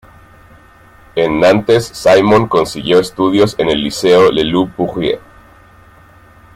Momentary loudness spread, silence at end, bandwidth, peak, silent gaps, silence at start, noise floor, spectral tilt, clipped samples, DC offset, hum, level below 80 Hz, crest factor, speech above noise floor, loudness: 8 LU; 1.35 s; 15 kHz; 0 dBFS; none; 1.15 s; -43 dBFS; -5.5 dB/octave; under 0.1%; under 0.1%; none; -42 dBFS; 14 dB; 31 dB; -12 LUFS